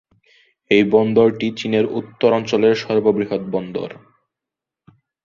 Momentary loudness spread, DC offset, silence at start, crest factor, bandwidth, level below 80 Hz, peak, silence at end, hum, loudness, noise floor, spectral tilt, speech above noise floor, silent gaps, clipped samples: 10 LU; under 0.1%; 0.7 s; 18 dB; 7.4 kHz; -58 dBFS; -2 dBFS; 1.3 s; none; -18 LUFS; -86 dBFS; -6.5 dB/octave; 69 dB; none; under 0.1%